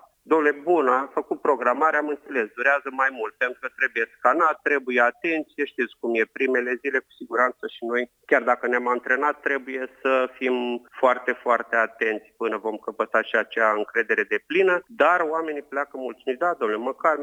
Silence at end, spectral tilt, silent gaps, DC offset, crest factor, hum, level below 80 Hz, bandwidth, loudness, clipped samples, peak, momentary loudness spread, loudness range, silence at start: 0 s; -4.5 dB/octave; none; under 0.1%; 20 dB; none; -76 dBFS; 10 kHz; -23 LUFS; under 0.1%; -4 dBFS; 8 LU; 2 LU; 0.25 s